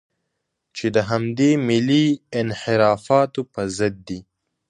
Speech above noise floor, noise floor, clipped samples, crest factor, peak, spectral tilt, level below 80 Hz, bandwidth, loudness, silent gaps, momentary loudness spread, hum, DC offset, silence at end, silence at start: 57 dB; -77 dBFS; under 0.1%; 18 dB; -2 dBFS; -6 dB/octave; -54 dBFS; 10.5 kHz; -20 LUFS; none; 12 LU; none; under 0.1%; 0.5 s; 0.75 s